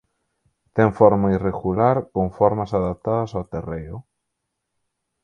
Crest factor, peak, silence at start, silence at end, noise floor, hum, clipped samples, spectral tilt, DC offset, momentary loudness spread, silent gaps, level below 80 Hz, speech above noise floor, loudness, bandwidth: 22 dB; 0 dBFS; 0.75 s; 1.2 s; -78 dBFS; none; under 0.1%; -9.5 dB/octave; under 0.1%; 15 LU; none; -44 dBFS; 59 dB; -21 LUFS; 7 kHz